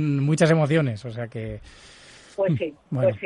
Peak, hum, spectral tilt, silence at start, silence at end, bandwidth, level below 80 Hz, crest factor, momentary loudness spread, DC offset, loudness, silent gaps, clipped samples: -6 dBFS; none; -7 dB/octave; 0 s; 0 s; 11 kHz; -54 dBFS; 18 dB; 16 LU; under 0.1%; -23 LUFS; none; under 0.1%